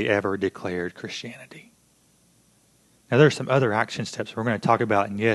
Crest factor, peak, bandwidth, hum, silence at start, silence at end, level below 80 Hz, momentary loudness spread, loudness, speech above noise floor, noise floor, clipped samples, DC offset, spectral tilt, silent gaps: 22 dB; -4 dBFS; 12 kHz; none; 0 s; 0 s; -60 dBFS; 15 LU; -24 LUFS; 38 dB; -61 dBFS; under 0.1%; under 0.1%; -6 dB/octave; none